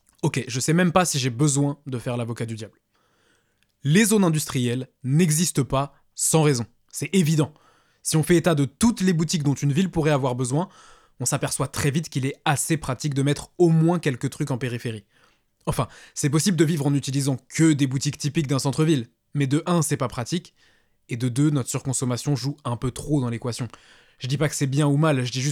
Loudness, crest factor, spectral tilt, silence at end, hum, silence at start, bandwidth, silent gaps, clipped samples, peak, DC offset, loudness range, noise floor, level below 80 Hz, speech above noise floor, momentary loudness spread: -23 LUFS; 20 dB; -5 dB/octave; 0 s; none; 0.25 s; 16 kHz; none; under 0.1%; -4 dBFS; under 0.1%; 4 LU; -67 dBFS; -52 dBFS; 44 dB; 10 LU